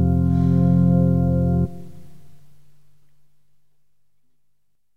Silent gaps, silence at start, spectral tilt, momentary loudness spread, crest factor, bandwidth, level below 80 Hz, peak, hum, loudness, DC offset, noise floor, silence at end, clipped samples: none; 0 s; -12 dB/octave; 8 LU; 14 dB; 1.8 kHz; -40 dBFS; -8 dBFS; none; -19 LUFS; 1%; -73 dBFS; 0 s; under 0.1%